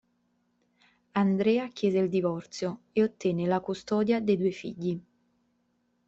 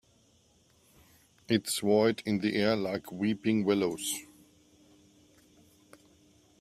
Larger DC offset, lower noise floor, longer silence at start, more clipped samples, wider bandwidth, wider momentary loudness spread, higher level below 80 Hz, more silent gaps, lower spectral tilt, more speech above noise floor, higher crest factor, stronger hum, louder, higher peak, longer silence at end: neither; first, -73 dBFS vs -66 dBFS; second, 1.15 s vs 1.5 s; neither; second, 8 kHz vs 15.5 kHz; about the same, 8 LU vs 8 LU; about the same, -68 dBFS vs -70 dBFS; neither; first, -7 dB/octave vs -4.5 dB/octave; first, 46 dB vs 37 dB; about the same, 16 dB vs 20 dB; neither; about the same, -28 LUFS vs -29 LUFS; about the same, -14 dBFS vs -12 dBFS; second, 1.05 s vs 2.35 s